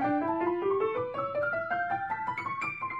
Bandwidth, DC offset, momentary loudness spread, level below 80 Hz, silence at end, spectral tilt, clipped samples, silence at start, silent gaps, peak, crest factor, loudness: 8 kHz; under 0.1%; 4 LU; -68 dBFS; 0 s; -7.5 dB/octave; under 0.1%; 0 s; none; -18 dBFS; 12 dB; -31 LUFS